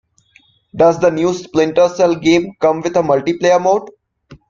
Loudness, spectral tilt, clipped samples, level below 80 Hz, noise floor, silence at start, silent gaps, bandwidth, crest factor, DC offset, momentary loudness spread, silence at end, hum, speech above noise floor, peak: -14 LUFS; -5.5 dB/octave; under 0.1%; -52 dBFS; -53 dBFS; 0.75 s; none; 7.6 kHz; 14 dB; under 0.1%; 5 LU; 0.15 s; none; 39 dB; 0 dBFS